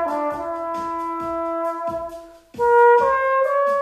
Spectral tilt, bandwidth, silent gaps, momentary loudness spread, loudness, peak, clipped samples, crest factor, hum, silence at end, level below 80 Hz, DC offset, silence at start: -5.5 dB/octave; 13 kHz; none; 15 LU; -20 LUFS; -6 dBFS; under 0.1%; 14 dB; none; 0 s; -54 dBFS; under 0.1%; 0 s